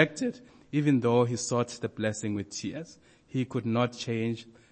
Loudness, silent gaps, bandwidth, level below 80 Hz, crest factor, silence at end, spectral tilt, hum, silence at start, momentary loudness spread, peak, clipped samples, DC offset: -30 LUFS; none; 8.8 kHz; -68 dBFS; 22 dB; 0.2 s; -5.5 dB/octave; none; 0 s; 12 LU; -8 dBFS; under 0.1%; under 0.1%